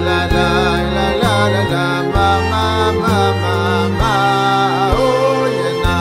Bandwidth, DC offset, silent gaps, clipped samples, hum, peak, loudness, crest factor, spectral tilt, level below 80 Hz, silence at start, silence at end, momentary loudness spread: 15.5 kHz; under 0.1%; none; under 0.1%; none; 0 dBFS; -14 LUFS; 14 dB; -5.5 dB/octave; -26 dBFS; 0 s; 0 s; 3 LU